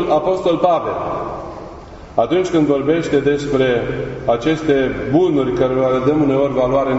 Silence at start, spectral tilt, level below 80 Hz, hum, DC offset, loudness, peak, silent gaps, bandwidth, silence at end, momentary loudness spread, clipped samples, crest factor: 0 s; -7 dB/octave; -40 dBFS; none; under 0.1%; -17 LUFS; -2 dBFS; none; 8 kHz; 0 s; 9 LU; under 0.1%; 14 dB